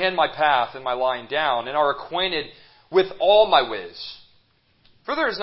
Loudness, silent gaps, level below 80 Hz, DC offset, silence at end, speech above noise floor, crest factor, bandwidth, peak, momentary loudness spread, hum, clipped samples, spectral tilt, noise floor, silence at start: -21 LUFS; none; -58 dBFS; under 0.1%; 0 s; 40 dB; 20 dB; 5.8 kHz; -2 dBFS; 17 LU; none; under 0.1%; -8 dB/octave; -61 dBFS; 0 s